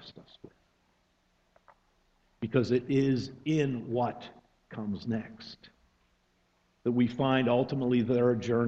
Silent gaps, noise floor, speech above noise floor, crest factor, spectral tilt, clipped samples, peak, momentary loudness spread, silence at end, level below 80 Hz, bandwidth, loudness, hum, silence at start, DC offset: none; -71 dBFS; 43 dB; 20 dB; -7.5 dB/octave; under 0.1%; -12 dBFS; 19 LU; 0 s; -64 dBFS; 7.8 kHz; -29 LUFS; none; 0 s; under 0.1%